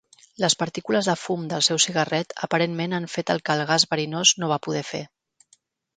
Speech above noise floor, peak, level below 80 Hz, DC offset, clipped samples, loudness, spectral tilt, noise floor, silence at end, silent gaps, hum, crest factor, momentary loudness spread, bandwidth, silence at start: 39 dB; -4 dBFS; -68 dBFS; under 0.1%; under 0.1%; -22 LUFS; -3 dB/octave; -63 dBFS; 0.9 s; none; none; 22 dB; 9 LU; 10 kHz; 0.4 s